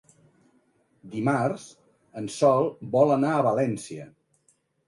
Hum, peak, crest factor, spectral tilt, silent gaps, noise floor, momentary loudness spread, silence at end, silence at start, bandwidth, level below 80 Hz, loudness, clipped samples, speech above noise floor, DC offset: none; -8 dBFS; 20 dB; -6.5 dB/octave; none; -68 dBFS; 17 LU; 0.8 s; 1.05 s; 11.5 kHz; -70 dBFS; -24 LUFS; under 0.1%; 44 dB; under 0.1%